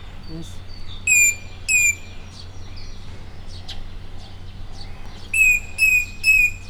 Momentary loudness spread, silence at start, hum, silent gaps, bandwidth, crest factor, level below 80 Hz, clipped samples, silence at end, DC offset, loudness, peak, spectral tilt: 25 LU; 0 s; none; none; over 20 kHz; 16 dB; -34 dBFS; under 0.1%; 0 s; under 0.1%; -16 LUFS; -6 dBFS; -0.5 dB/octave